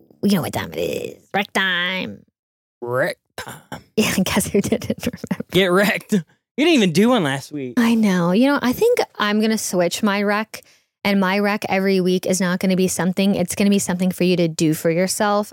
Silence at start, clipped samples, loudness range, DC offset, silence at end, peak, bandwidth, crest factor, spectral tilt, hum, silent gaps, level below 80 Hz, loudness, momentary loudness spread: 0.25 s; under 0.1%; 5 LU; under 0.1%; 0 s; -4 dBFS; 17 kHz; 14 dB; -5 dB/octave; none; 2.39-2.81 s, 6.51-6.55 s; -54 dBFS; -19 LUFS; 10 LU